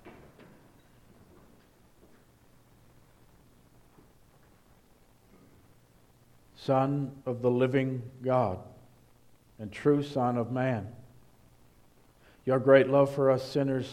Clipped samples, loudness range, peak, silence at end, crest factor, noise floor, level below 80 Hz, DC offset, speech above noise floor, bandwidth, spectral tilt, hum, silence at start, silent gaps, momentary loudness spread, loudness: under 0.1%; 7 LU; -8 dBFS; 0 s; 24 dB; -61 dBFS; -66 dBFS; under 0.1%; 34 dB; 13 kHz; -8 dB/octave; none; 0.05 s; none; 16 LU; -28 LUFS